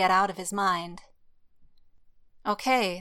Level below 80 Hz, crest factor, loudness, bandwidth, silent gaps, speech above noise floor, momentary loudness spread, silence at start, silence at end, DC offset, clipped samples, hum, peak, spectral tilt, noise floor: -62 dBFS; 18 dB; -27 LUFS; 16.5 kHz; none; 31 dB; 10 LU; 0 s; 0 s; under 0.1%; under 0.1%; none; -10 dBFS; -3.5 dB/octave; -57 dBFS